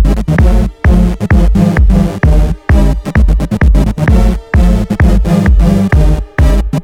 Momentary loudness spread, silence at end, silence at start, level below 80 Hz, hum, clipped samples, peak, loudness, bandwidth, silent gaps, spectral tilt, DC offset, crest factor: 3 LU; 0 s; 0 s; -10 dBFS; none; under 0.1%; 0 dBFS; -10 LUFS; 11.5 kHz; none; -8 dB/octave; under 0.1%; 8 dB